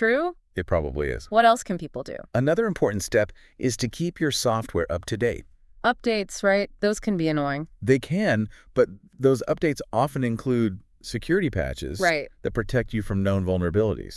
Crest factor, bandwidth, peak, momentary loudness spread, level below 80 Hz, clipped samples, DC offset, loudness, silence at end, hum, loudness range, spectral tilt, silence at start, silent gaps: 20 dB; 12 kHz; -4 dBFS; 7 LU; -44 dBFS; under 0.1%; under 0.1%; -25 LUFS; 0 s; none; 2 LU; -5.5 dB/octave; 0 s; none